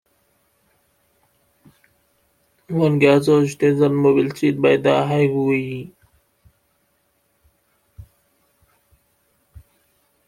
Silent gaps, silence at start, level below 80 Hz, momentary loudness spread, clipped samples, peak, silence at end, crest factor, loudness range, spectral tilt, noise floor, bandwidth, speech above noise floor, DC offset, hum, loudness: none; 2.7 s; -58 dBFS; 11 LU; under 0.1%; -2 dBFS; 2.25 s; 20 dB; 9 LU; -7 dB/octave; -66 dBFS; 14.5 kHz; 49 dB; under 0.1%; none; -17 LUFS